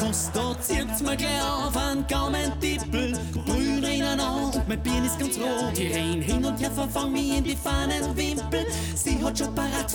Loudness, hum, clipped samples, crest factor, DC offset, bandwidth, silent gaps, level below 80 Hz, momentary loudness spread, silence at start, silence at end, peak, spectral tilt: -26 LUFS; none; under 0.1%; 12 dB; under 0.1%; 19.5 kHz; none; -34 dBFS; 2 LU; 0 s; 0 s; -14 dBFS; -4 dB/octave